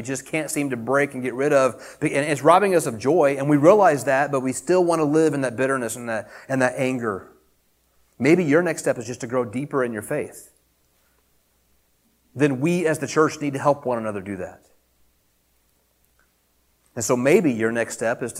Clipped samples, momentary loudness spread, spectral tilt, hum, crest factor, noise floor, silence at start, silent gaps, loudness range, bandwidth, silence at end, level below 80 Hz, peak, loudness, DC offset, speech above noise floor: under 0.1%; 12 LU; -5.5 dB/octave; none; 20 dB; -65 dBFS; 0 s; none; 10 LU; 16.5 kHz; 0 s; -64 dBFS; -2 dBFS; -21 LUFS; under 0.1%; 44 dB